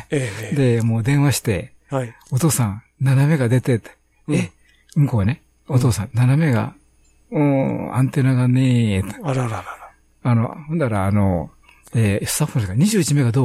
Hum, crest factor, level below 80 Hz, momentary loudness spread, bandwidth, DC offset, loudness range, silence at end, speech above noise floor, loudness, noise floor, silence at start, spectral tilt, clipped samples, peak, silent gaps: none; 14 dB; -48 dBFS; 10 LU; 15.5 kHz; under 0.1%; 2 LU; 0 s; 37 dB; -19 LUFS; -55 dBFS; 0 s; -6.5 dB/octave; under 0.1%; -4 dBFS; none